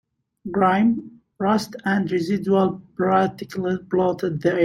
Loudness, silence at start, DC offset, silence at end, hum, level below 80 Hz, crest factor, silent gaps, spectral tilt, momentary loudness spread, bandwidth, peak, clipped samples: -22 LUFS; 0.45 s; under 0.1%; 0 s; none; -58 dBFS; 16 dB; none; -7 dB/octave; 7 LU; 13 kHz; -4 dBFS; under 0.1%